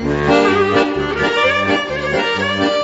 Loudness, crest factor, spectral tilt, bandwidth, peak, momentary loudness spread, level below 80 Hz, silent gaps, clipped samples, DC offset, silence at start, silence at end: -15 LUFS; 14 dB; -5 dB/octave; 8 kHz; -2 dBFS; 5 LU; -38 dBFS; none; under 0.1%; under 0.1%; 0 s; 0 s